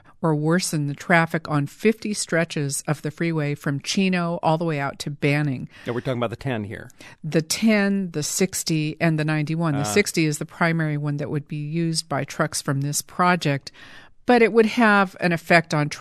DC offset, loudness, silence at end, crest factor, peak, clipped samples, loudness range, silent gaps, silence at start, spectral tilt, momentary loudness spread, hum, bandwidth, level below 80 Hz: under 0.1%; -22 LUFS; 0 s; 20 dB; -2 dBFS; under 0.1%; 4 LU; none; 0.2 s; -5 dB/octave; 10 LU; none; 14 kHz; -58 dBFS